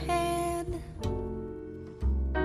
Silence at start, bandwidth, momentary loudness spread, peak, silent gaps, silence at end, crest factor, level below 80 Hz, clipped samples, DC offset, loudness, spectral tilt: 0 s; 14.5 kHz; 11 LU; -16 dBFS; none; 0 s; 14 dB; -36 dBFS; under 0.1%; under 0.1%; -34 LUFS; -6 dB/octave